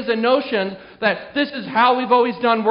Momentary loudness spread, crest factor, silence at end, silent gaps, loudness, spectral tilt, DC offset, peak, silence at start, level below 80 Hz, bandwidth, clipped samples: 7 LU; 16 dB; 0 s; none; -19 LUFS; -2 dB/octave; under 0.1%; -2 dBFS; 0 s; -62 dBFS; 5.4 kHz; under 0.1%